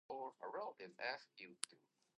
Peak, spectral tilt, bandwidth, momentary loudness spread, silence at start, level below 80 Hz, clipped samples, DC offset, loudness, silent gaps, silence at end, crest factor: -20 dBFS; -1 dB/octave; 9.4 kHz; 5 LU; 0.1 s; under -90 dBFS; under 0.1%; under 0.1%; -49 LUFS; none; 0.4 s; 32 dB